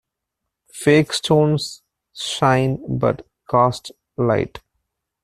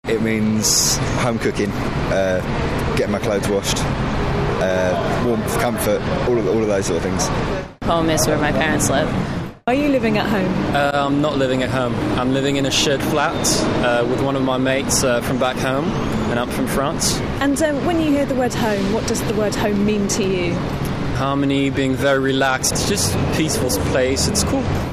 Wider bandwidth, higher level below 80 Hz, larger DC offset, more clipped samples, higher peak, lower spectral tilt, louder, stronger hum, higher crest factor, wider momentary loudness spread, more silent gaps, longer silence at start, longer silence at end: about the same, 14 kHz vs 14 kHz; second, -52 dBFS vs -34 dBFS; neither; neither; about the same, -2 dBFS vs -4 dBFS; about the same, -5.5 dB/octave vs -4.5 dB/octave; about the same, -19 LUFS vs -18 LUFS; neither; about the same, 18 dB vs 16 dB; first, 13 LU vs 4 LU; neither; first, 0.75 s vs 0.05 s; first, 0.65 s vs 0 s